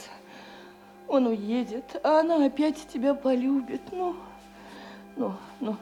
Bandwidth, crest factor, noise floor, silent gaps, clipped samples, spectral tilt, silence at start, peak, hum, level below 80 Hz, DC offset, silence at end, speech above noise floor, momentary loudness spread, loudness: 12.5 kHz; 16 dB; -49 dBFS; none; under 0.1%; -6 dB/octave; 0 s; -12 dBFS; none; -64 dBFS; under 0.1%; 0 s; 23 dB; 23 LU; -27 LUFS